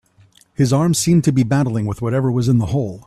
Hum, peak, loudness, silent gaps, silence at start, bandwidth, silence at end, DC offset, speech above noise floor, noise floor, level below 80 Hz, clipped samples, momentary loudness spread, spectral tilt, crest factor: none; -4 dBFS; -17 LUFS; none; 0.6 s; 13.5 kHz; 0.05 s; under 0.1%; 36 dB; -52 dBFS; -44 dBFS; under 0.1%; 6 LU; -6.5 dB/octave; 12 dB